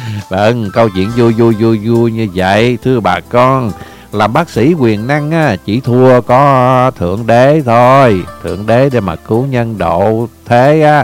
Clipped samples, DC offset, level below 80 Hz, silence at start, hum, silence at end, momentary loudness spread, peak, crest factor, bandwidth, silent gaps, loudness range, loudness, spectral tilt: 0.8%; under 0.1%; -40 dBFS; 0 s; none; 0 s; 8 LU; 0 dBFS; 10 dB; 16 kHz; none; 3 LU; -10 LUFS; -7.5 dB/octave